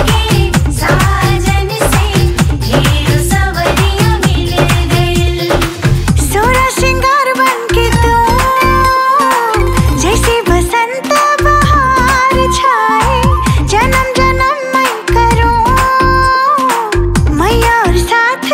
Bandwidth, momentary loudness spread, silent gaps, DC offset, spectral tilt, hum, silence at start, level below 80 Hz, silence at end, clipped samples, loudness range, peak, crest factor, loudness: 16.5 kHz; 3 LU; none; under 0.1%; -5 dB/octave; none; 0 s; -18 dBFS; 0 s; under 0.1%; 2 LU; 0 dBFS; 10 dB; -10 LUFS